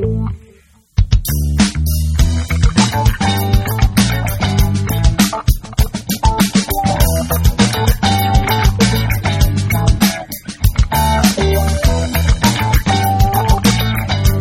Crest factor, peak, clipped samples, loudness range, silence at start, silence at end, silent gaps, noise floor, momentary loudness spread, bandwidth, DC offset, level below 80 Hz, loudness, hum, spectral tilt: 14 dB; 0 dBFS; under 0.1%; 1 LU; 0 s; 0 s; none; -47 dBFS; 5 LU; 17 kHz; under 0.1%; -18 dBFS; -15 LUFS; none; -5 dB/octave